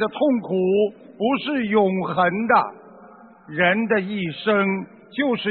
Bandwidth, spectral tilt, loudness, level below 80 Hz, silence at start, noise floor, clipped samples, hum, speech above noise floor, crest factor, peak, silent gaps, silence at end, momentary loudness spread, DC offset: 4.5 kHz; -4 dB/octave; -21 LUFS; -64 dBFS; 0 s; -46 dBFS; under 0.1%; none; 26 dB; 18 dB; -4 dBFS; none; 0 s; 8 LU; under 0.1%